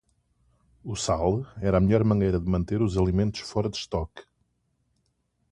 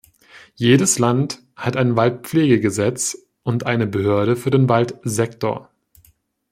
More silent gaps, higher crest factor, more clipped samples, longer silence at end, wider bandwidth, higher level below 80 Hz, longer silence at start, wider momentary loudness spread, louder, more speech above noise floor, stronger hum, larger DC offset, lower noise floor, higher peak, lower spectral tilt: neither; about the same, 20 dB vs 18 dB; neither; first, 1.3 s vs 0.9 s; second, 11 kHz vs 16 kHz; first, -40 dBFS vs -56 dBFS; first, 0.85 s vs 0.35 s; about the same, 10 LU vs 9 LU; second, -26 LUFS vs -19 LUFS; first, 48 dB vs 40 dB; neither; neither; first, -73 dBFS vs -58 dBFS; second, -8 dBFS vs -2 dBFS; about the same, -6.5 dB/octave vs -5.5 dB/octave